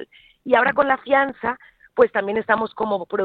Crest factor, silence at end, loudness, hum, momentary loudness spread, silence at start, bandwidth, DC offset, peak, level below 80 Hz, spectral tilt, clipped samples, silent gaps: 18 dB; 0 s; -20 LUFS; none; 11 LU; 0 s; 4.7 kHz; under 0.1%; -2 dBFS; -60 dBFS; -7.5 dB/octave; under 0.1%; none